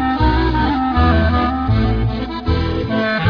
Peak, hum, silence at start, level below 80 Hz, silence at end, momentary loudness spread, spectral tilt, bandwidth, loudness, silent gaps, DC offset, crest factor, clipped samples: -2 dBFS; none; 0 s; -22 dBFS; 0 s; 5 LU; -8.5 dB/octave; 5.4 kHz; -17 LUFS; none; under 0.1%; 14 dB; under 0.1%